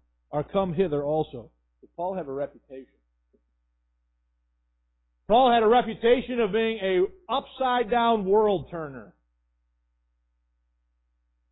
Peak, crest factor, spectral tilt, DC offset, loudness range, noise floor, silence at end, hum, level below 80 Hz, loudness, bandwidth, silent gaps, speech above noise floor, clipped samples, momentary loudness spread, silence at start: -8 dBFS; 18 dB; -10 dB/octave; under 0.1%; 15 LU; -73 dBFS; 2.45 s; 60 Hz at -60 dBFS; -56 dBFS; -25 LUFS; 4.1 kHz; none; 49 dB; under 0.1%; 16 LU; 0.3 s